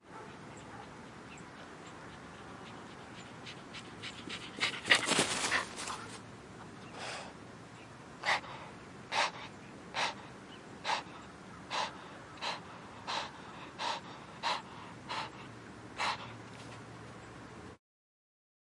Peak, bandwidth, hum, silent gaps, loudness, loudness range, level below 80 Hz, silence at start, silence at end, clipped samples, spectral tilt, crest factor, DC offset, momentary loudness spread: -10 dBFS; 11.5 kHz; none; none; -37 LUFS; 13 LU; -70 dBFS; 0.05 s; 1 s; under 0.1%; -2 dB/octave; 30 dB; under 0.1%; 17 LU